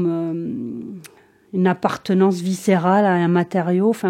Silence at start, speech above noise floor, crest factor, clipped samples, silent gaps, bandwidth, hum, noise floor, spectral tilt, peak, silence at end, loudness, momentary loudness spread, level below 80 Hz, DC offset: 0 s; 30 dB; 16 dB; under 0.1%; none; 14.5 kHz; none; -48 dBFS; -7 dB/octave; -2 dBFS; 0 s; -19 LUFS; 13 LU; -66 dBFS; under 0.1%